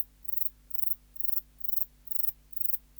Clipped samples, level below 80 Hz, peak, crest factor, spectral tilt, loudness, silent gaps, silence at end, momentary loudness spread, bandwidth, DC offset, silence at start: under 0.1%; -60 dBFS; -12 dBFS; 20 dB; -2.5 dB/octave; -29 LUFS; none; 0.2 s; 2 LU; over 20 kHz; under 0.1%; 0 s